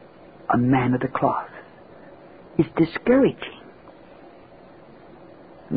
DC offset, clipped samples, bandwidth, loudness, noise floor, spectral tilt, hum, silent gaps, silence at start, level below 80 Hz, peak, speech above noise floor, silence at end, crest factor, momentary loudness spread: 0.1%; under 0.1%; 5 kHz; -22 LUFS; -47 dBFS; -12 dB/octave; none; none; 0.5 s; -54 dBFS; -6 dBFS; 27 dB; 0 s; 18 dB; 19 LU